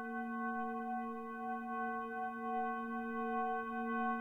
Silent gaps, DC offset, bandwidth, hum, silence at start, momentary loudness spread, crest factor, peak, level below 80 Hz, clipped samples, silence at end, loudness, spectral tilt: none; under 0.1%; 3.9 kHz; none; 0 s; 4 LU; 14 dB; -26 dBFS; -74 dBFS; under 0.1%; 0 s; -40 LUFS; -7 dB/octave